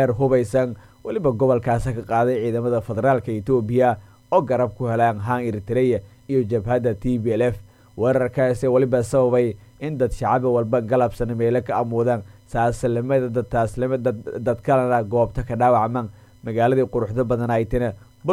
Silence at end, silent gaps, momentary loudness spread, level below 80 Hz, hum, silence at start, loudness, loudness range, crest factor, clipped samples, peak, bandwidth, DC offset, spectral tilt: 0 s; none; 7 LU; -42 dBFS; none; 0 s; -21 LUFS; 2 LU; 16 dB; under 0.1%; -4 dBFS; 14 kHz; under 0.1%; -8 dB/octave